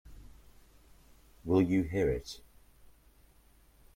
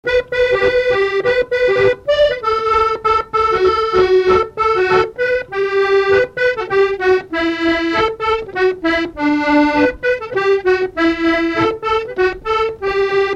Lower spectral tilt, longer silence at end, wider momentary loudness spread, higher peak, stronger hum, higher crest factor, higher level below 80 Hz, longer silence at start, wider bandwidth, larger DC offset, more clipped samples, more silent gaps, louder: first, -7.5 dB/octave vs -5.5 dB/octave; first, 1.55 s vs 0 s; first, 20 LU vs 5 LU; second, -16 dBFS vs -2 dBFS; neither; first, 20 dB vs 14 dB; second, -52 dBFS vs -40 dBFS; about the same, 0.05 s vs 0.05 s; first, 16 kHz vs 8.2 kHz; neither; neither; neither; second, -31 LUFS vs -15 LUFS